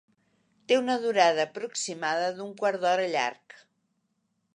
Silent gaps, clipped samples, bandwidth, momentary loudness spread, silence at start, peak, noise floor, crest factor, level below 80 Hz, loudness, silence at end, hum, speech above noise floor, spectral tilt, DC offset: none; under 0.1%; 10.5 kHz; 9 LU; 0.7 s; -6 dBFS; -76 dBFS; 22 dB; -84 dBFS; -27 LUFS; 1.2 s; none; 49 dB; -2.5 dB/octave; under 0.1%